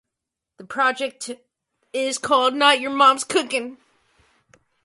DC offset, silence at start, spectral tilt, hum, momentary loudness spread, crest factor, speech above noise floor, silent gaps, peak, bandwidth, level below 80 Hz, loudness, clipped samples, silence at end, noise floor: under 0.1%; 0.6 s; -1 dB/octave; none; 18 LU; 22 dB; 64 dB; none; 0 dBFS; 11.5 kHz; -68 dBFS; -19 LUFS; under 0.1%; 1.1 s; -84 dBFS